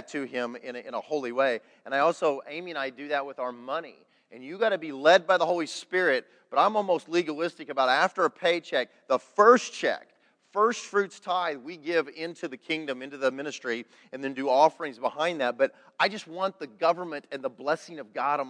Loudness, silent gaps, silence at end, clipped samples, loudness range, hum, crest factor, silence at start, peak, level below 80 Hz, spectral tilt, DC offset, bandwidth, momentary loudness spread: -27 LUFS; none; 0 s; under 0.1%; 5 LU; none; 22 dB; 0 s; -4 dBFS; under -90 dBFS; -3.5 dB/octave; under 0.1%; 10.5 kHz; 13 LU